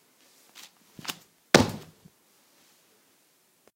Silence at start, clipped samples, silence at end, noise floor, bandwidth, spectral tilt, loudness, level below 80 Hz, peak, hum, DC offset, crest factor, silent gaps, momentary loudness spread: 1.05 s; under 0.1%; 1.95 s; -66 dBFS; 16.5 kHz; -4 dB/octave; -26 LUFS; -60 dBFS; 0 dBFS; none; under 0.1%; 32 dB; none; 27 LU